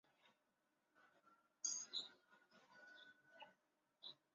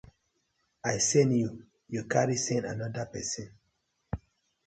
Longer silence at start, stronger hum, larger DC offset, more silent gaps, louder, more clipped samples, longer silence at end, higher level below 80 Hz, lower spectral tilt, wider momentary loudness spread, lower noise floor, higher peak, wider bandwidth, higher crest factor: second, 0.25 s vs 0.85 s; neither; neither; neither; second, -49 LUFS vs -30 LUFS; neither; second, 0.2 s vs 0.5 s; second, under -90 dBFS vs -56 dBFS; second, 2 dB/octave vs -4.5 dB/octave; first, 20 LU vs 17 LU; first, -87 dBFS vs -77 dBFS; second, -32 dBFS vs -10 dBFS; second, 7.4 kHz vs 9.4 kHz; about the same, 26 dB vs 22 dB